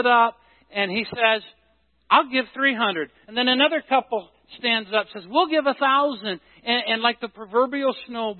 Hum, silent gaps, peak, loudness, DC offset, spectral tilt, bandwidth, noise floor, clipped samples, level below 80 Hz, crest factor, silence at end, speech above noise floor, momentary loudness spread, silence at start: none; none; -2 dBFS; -22 LUFS; under 0.1%; -8 dB/octave; 4.5 kHz; -65 dBFS; under 0.1%; -70 dBFS; 20 dB; 0 s; 42 dB; 11 LU; 0 s